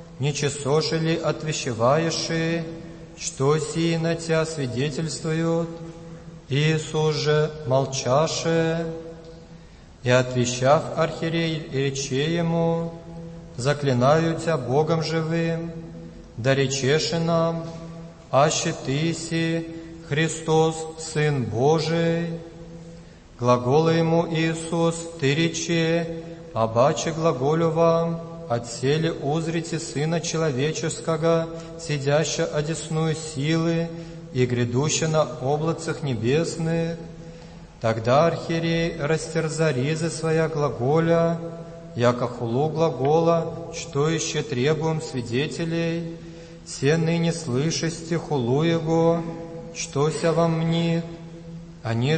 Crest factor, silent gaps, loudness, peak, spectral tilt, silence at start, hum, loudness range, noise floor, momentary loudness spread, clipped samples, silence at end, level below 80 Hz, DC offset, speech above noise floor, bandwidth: 18 dB; none; -23 LUFS; -4 dBFS; -5.5 dB/octave; 0 s; none; 2 LU; -45 dBFS; 15 LU; under 0.1%; 0 s; -50 dBFS; under 0.1%; 23 dB; 8.8 kHz